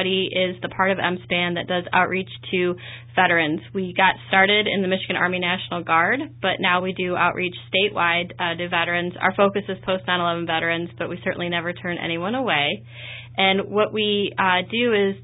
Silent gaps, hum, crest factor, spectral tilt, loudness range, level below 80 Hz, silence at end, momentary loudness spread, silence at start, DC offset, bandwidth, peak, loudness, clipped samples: none; none; 18 dB; -9.5 dB/octave; 4 LU; -56 dBFS; 0 s; 8 LU; 0 s; under 0.1%; 4 kHz; -4 dBFS; -21 LUFS; under 0.1%